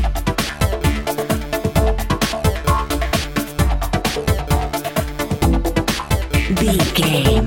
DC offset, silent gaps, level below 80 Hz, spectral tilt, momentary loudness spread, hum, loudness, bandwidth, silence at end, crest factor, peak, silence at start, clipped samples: under 0.1%; none; -22 dBFS; -5 dB/octave; 6 LU; none; -19 LUFS; 17 kHz; 0 s; 16 dB; -2 dBFS; 0 s; under 0.1%